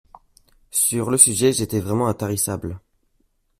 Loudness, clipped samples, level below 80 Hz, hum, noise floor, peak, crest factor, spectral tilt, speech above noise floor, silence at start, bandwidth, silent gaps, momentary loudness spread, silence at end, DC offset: -18 LUFS; under 0.1%; -52 dBFS; none; -66 dBFS; 0 dBFS; 22 dB; -4 dB/octave; 46 dB; 0.75 s; 16 kHz; none; 11 LU; 0.8 s; under 0.1%